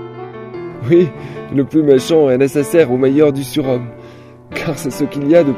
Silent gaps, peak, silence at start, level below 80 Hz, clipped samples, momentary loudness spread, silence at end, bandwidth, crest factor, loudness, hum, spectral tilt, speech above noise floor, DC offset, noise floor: none; 0 dBFS; 0 s; -50 dBFS; under 0.1%; 17 LU; 0 s; 16 kHz; 14 dB; -14 LUFS; none; -6.5 dB/octave; 24 dB; under 0.1%; -37 dBFS